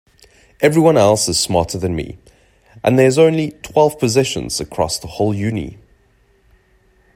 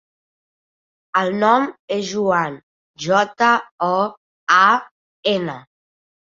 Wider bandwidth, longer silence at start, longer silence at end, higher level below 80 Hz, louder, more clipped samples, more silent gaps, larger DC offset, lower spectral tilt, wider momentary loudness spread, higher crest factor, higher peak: first, 16 kHz vs 7.8 kHz; second, 0.6 s vs 1.15 s; first, 1.4 s vs 0.75 s; first, -44 dBFS vs -66 dBFS; about the same, -16 LUFS vs -18 LUFS; neither; second, none vs 1.79-1.88 s, 2.63-2.94 s, 3.71-3.78 s, 4.17-4.47 s, 4.91-5.23 s; neither; about the same, -5 dB/octave vs -4.5 dB/octave; about the same, 11 LU vs 12 LU; about the same, 16 dB vs 18 dB; about the same, 0 dBFS vs -2 dBFS